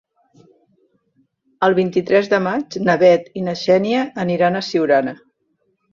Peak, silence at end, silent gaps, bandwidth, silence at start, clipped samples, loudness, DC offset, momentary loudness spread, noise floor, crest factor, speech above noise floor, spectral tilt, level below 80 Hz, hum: -2 dBFS; 0.8 s; none; 7.4 kHz; 1.6 s; under 0.1%; -17 LUFS; under 0.1%; 8 LU; -67 dBFS; 16 dB; 51 dB; -6.5 dB/octave; -62 dBFS; none